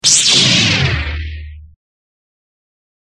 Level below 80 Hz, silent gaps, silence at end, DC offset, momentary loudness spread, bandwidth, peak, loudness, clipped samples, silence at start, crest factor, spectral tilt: -32 dBFS; none; 1.45 s; under 0.1%; 19 LU; 13 kHz; 0 dBFS; -10 LUFS; under 0.1%; 0.05 s; 16 dB; -1.5 dB/octave